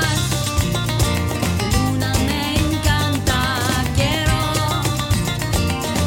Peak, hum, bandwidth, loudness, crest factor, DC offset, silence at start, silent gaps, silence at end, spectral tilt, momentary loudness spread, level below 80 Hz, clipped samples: -4 dBFS; none; 17 kHz; -19 LUFS; 14 dB; under 0.1%; 0 s; none; 0 s; -4.5 dB/octave; 2 LU; -28 dBFS; under 0.1%